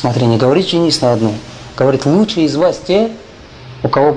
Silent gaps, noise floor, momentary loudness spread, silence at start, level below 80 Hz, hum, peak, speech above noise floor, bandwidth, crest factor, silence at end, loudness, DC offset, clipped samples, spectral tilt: none; -34 dBFS; 12 LU; 0 s; -44 dBFS; none; 0 dBFS; 22 dB; 10.5 kHz; 14 dB; 0 s; -13 LUFS; under 0.1%; under 0.1%; -6 dB/octave